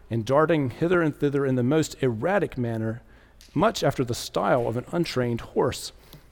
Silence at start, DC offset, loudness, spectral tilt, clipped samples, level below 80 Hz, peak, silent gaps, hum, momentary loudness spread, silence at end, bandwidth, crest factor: 0.1 s; under 0.1%; -25 LUFS; -6 dB/octave; under 0.1%; -50 dBFS; -8 dBFS; none; none; 7 LU; 0.15 s; 18 kHz; 18 dB